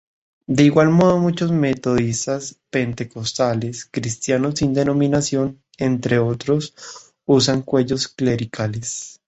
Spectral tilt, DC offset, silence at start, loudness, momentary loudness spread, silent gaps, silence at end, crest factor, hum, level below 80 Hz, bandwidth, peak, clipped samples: -5.5 dB/octave; under 0.1%; 0.5 s; -19 LUFS; 12 LU; none; 0.2 s; 18 dB; none; -50 dBFS; 8.2 kHz; -2 dBFS; under 0.1%